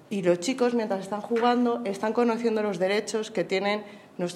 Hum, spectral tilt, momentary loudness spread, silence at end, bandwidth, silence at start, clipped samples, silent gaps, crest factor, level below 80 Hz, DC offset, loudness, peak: none; -5 dB/octave; 6 LU; 0 s; 13.5 kHz; 0.1 s; under 0.1%; none; 16 dB; -82 dBFS; under 0.1%; -26 LUFS; -10 dBFS